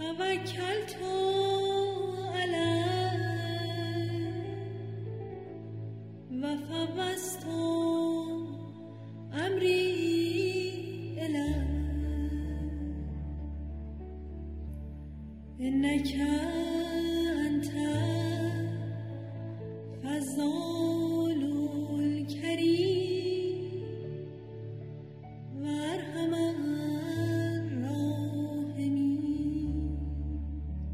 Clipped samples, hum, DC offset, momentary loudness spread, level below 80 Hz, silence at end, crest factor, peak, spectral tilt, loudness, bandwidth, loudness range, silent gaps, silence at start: under 0.1%; none; under 0.1%; 13 LU; -44 dBFS; 0 s; 16 dB; -16 dBFS; -6 dB/octave; -32 LUFS; 15.5 kHz; 6 LU; none; 0 s